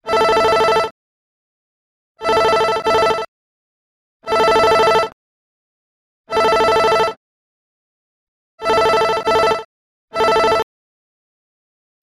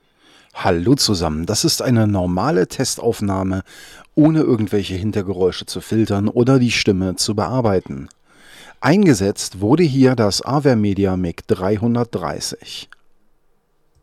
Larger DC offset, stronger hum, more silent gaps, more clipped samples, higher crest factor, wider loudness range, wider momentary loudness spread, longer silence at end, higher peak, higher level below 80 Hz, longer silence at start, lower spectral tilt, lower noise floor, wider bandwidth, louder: neither; neither; first, 0.91-2.15 s, 3.28-4.20 s, 5.13-6.24 s, 7.17-8.58 s, 9.65-10.08 s vs none; neither; about the same, 16 dB vs 14 dB; about the same, 3 LU vs 3 LU; first, 12 LU vs 9 LU; first, 1.4 s vs 1.2 s; about the same, -2 dBFS vs -4 dBFS; about the same, -48 dBFS vs -48 dBFS; second, 0.05 s vs 0.55 s; second, -3 dB/octave vs -5.5 dB/octave; first, under -90 dBFS vs -59 dBFS; about the same, 14.5 kHz vs 15 kHz; about the same, -15 LUFS vs -17 LUFS